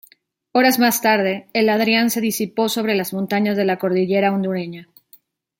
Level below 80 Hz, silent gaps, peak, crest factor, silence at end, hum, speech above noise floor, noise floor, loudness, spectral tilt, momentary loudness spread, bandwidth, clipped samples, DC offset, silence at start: -66 dBFS; none; -2 dBFS; 16 dB; 0.75 s; none; 37 dB; -55 dBFS; -18 LUFS; -4.5 dB/octave; 7 LU; 17 kHz; under 0.1%; under 0.1%; 0.55 s